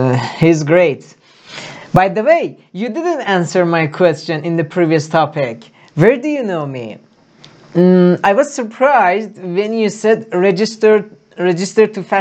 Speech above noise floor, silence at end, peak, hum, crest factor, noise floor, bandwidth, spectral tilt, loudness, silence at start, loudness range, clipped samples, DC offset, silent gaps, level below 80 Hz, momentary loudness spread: 31 dB; 0 s; 0 dBFS; none; 14 dB; -44 dBFS; 9 kHz; -6.5 dB/octave; -14 LUFS; 0 s; 3 LU; under 0.1%; under 0.1%; none; -50 dBFS; 13 LU